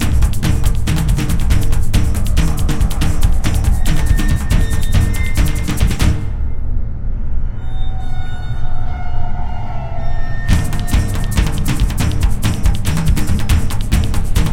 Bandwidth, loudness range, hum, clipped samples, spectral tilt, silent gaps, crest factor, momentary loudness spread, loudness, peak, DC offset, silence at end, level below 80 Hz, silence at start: 16 kHz; 7 LU; none; under 0.1%; -5.5 dB/octave; none; 12 dB; 8 LU; -18 LUFS; 0 dBFS; under 0.1%; 0 s; -16 dBFS; 0 s